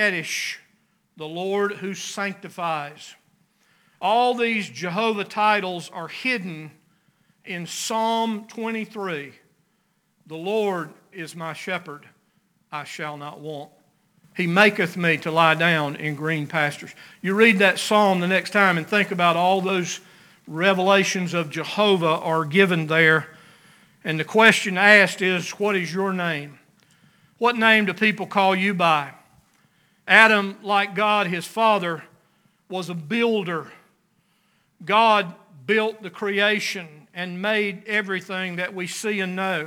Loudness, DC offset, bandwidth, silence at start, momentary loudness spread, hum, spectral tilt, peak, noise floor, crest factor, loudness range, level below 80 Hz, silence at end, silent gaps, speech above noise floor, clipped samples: -21 LUFS; under 0.1%; 19.5 kHz; 0 s; 17 LU; none; -4.5 dB/octave; 0 dBFS; -68 dBFS; 22 dB; 11 LU; -78 dBFS; 0 s; none; 46 dB; under 0.1%